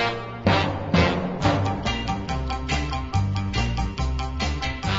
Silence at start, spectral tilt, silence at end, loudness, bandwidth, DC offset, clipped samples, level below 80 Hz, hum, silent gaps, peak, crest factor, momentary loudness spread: 0 s; -5.5 dB/octave; 0 s; -25 LUFS; 7.8 kHz; under 0.1%; under 0.1%; -32 dBFS; none; none; -6 dBFS; 18 dB; 6 LU